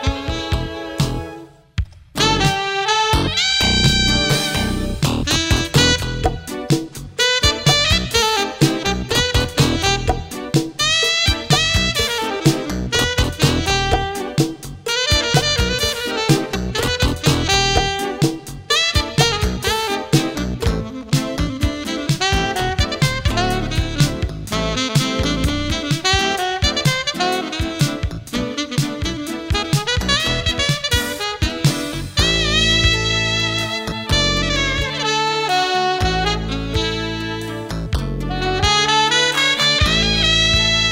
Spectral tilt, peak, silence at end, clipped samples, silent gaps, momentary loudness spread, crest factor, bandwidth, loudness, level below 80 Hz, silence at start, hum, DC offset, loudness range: -3.5 dB/octave; -2 dBFS; 0 s; under 0.1%; none; 9 LU; 16 dB; 16.5 kHz; -17 LUFS; -28 dBFS; 0 s; none; under 0.1%; 4 LU